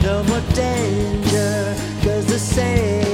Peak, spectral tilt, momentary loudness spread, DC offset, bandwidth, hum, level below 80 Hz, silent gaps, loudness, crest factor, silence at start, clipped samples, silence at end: -2 dBFS; -5.5 dB/octave; 3 LU; under 0.1%; 16.5 kHz; none; -30 dBFS; none; -19 LUFS; 16 dB; 0 s; under 0.1%; 0 s